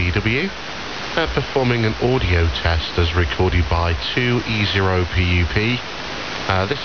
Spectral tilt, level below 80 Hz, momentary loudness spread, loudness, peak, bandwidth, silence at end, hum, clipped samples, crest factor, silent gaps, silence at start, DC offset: -6 dB/octave; -30 dBFS; 7 LU; -19 LUFS; -4 dBFS; 6.8 kHz; 0 s; none; under 0.1%; 16 dB; none; 0 s; 1%